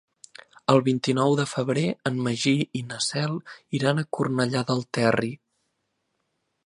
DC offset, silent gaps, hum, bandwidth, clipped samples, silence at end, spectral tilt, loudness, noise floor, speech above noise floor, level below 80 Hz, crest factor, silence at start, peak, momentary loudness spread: under 0.1%; none; none; 11.5 kHz; under 0.1%; 1.3 s; -5.5 dB/octave; -25 LUFS; -76 dBFS; 52 dB; -66 dBFS; 22 dB; 0.7 s; -4 dBFS; 9 LU